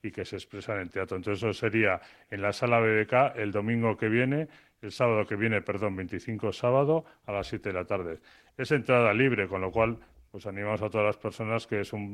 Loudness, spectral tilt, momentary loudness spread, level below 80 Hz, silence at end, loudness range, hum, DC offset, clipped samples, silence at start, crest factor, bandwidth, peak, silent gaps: -28 LUFS; -7 dB/octave; 14 LU; -58 dBFS; 0 s; 3 LU; none; under 0.1%; under 0.1%; 0.05 s; 20 dB; 12 kHz; -10 dBFS; none